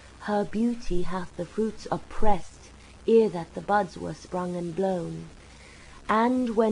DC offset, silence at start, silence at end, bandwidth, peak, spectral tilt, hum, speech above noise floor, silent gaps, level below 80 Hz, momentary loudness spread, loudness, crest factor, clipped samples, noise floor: under 0.1%; 0.05 s; 0 s; 10.5 kHz; -6 dBFS; -6.5 dB/octave; none; 23 dB; none; -38 dBFS; 18 LU; -28 LUFS; 20 dB; under 0.1%; -48 dBFS